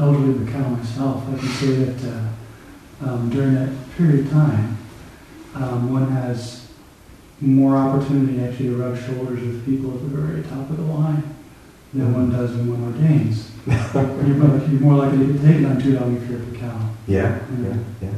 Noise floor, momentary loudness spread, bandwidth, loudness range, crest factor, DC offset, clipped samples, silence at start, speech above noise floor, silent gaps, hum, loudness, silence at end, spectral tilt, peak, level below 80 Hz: -45 dBFS; 12 LU; 12 kHz; 6 LU; 18 dB; under 0.1%; under 0.1%; 0 s; 26 dB; none; none; -20 LUFS; 0 s; -8.5 dB/octave; -2 dBFS; -48 dBFS